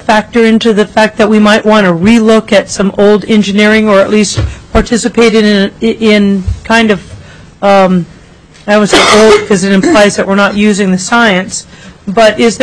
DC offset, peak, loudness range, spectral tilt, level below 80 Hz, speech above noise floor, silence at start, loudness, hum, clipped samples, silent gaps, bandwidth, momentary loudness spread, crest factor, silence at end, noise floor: under 0.1%; 0 dBFS; 3 LU; -4.5 dB/octave; -30 dBFS; 29 dB; 0 s; -7 LUFS; none; 0.8%; none; 11 kHz; 7 LU; 8 dB; 0 s; -36 dBFS